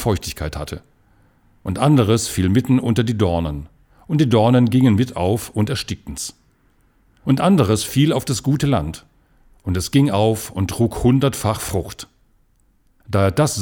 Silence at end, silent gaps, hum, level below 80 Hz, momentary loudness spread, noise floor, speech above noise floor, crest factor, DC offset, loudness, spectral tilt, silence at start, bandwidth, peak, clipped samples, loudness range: 0 s; none; none; -40 dBFS; 15 LU; -58 dBFS; 41 dB; 16 dB; under 0.1%; -18 LUFS; -6 dB/octave; 0 s; 19.5 kHz; -2 dBFS; under 0.1%; 3 LU